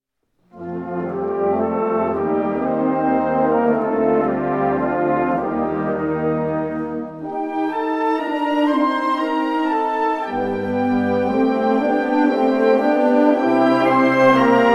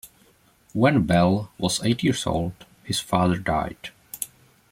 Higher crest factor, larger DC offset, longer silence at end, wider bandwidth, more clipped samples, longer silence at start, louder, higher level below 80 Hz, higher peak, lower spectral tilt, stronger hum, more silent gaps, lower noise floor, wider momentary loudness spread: about the same, 16 dB vs 18 dB; neither; second, 0 s vs 0.45 s; second, 11 kHz vs 16.5 kHz; neither; first, 0.55 s vs 0.05 s; first, -19 LUFS vs -23 LUFS; about the same, -52 dBFS vs -48 dBFS; first, -2 dBFS vs -8 dBFS; first, -7.5 dB/octave vs -5 dB/octave; neither; neither; first, -65 dBFS vs -59 dBFS; second, 8 LU vs 14 LU